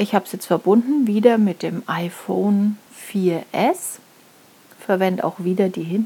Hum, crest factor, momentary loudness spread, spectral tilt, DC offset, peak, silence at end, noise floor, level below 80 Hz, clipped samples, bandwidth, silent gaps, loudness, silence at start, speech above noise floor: none; 20 dB; 11 LU; -6.5 dB/octave; under 0.1%; 0 dBFS; 0 s; -50 dBFS; -78 dBFS; under 0.1%; 18 kHz; none; -20 LUFS; 0 s; 31 dB